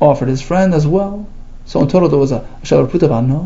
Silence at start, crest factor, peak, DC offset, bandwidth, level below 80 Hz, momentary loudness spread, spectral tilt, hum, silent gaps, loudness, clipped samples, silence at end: 0 s; 14 dB; 0 dBFS; under 0.1%; 7.8 kHz; -30 dBFS; 10 LU; -8 dB/octave; none; none; -14 LUFS; under 0.1%; 0 s